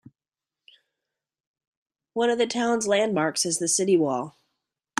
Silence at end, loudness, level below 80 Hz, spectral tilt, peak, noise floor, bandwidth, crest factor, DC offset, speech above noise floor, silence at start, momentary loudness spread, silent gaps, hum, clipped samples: 0.7 s; -24 LUFS; -74 dBFS; -3 dB/octave; -8 dBFS; under -90 dBFS; 14 kHz; 18 dB; under 0.1%; over 67 dB; 2.15 s; 8 LU; none; none; under 0.1%